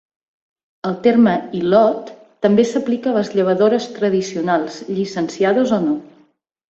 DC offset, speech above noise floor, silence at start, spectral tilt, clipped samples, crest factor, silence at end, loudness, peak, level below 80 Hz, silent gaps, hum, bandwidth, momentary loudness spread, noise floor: under 0.1%; 39 dB; 0.85 s; -6.5 dB/octave; under 0.1%; 16 dB; 0.65 s; -17 LUFS; -2 dBFS; -60 dBFS; none; none; 7.8 kHz; 10 LU; -55 dBFS